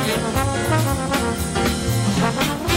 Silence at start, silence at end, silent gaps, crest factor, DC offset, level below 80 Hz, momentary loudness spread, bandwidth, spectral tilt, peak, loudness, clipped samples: 0 s; 0 s; none; 12 dB; under 0.1%; -34 dBFS; 2 LU; 16.5 kHz; -4.5 dB/octave; -8 dBFS; -20 LUFS; under 0.1%